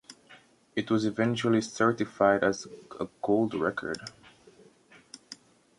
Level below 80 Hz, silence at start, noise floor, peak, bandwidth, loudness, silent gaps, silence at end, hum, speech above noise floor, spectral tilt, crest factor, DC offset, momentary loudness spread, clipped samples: -66 dBFS; 0.1 s; -58 dBFS; -10 dBFS; 11.5 kHz; -28 LUFS; none; 0.45 s; none; 30 dB; -5.5 dB/octave; 20 dB; under 0.1%; 21 LU; under 0.1%